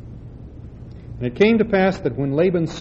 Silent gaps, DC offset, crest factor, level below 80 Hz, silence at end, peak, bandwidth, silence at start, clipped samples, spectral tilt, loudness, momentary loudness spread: none; under 0.1%; 18 dB; -42 dBFS; 0 s; -4 dBFS; 7.8 kHz; 0 s; under 0.1%; -7.5 dB/octave; -19 LUFS; 22 LU